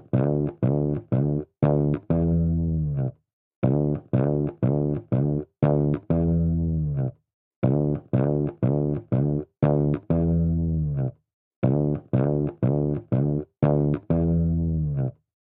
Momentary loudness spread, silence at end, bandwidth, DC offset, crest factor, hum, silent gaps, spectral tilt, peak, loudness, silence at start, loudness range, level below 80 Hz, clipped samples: 5 LU; 0.35 s; 3.6 kHz; under 0.1%; 16 dB; none; 3.33-3.62 s, 7.34-7.62 s, 11.34-11.62 s; -14.5 dB/octave; -8 dBFS; -24 LUFS; 0.15 s; 1 LU; -38 dBFS; under 0.1%